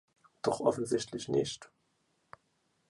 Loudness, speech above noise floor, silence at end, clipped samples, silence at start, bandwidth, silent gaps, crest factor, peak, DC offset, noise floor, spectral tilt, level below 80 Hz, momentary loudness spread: -33 LUFS; 44 dB; 1.25 s; under 0.1%; 0.45 s; 11.5 kHz; none; 24 dB; -12 dBFS; under 0.1%; -76 dBFS; -5 dB/octave; -70 dBFS; 7 LU